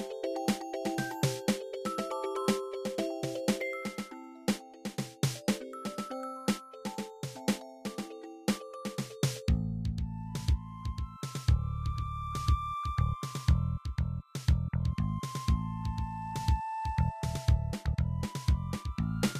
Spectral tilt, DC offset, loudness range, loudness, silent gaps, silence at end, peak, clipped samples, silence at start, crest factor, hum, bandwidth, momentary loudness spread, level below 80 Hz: -6 dB/octave; under 0.1%; 4 LU; -34 LUFS; none; 0 s; -14 dBFS; under 0.1%; 0 s; 18 dB; none; 15.5 kHz; 8 LU; -38 dBFS